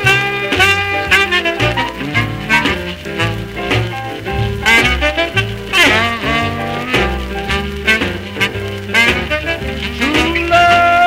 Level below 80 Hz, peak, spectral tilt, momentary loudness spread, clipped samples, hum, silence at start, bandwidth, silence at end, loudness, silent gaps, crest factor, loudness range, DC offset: -28 dBFS; 0 dBFS; -4 dB/octave; 10 LU; under 0.1%; none; 0 s; 16.5 kHz; 0 s; -14 LUFS; none; 14 dB; 3 LU; under 0.1%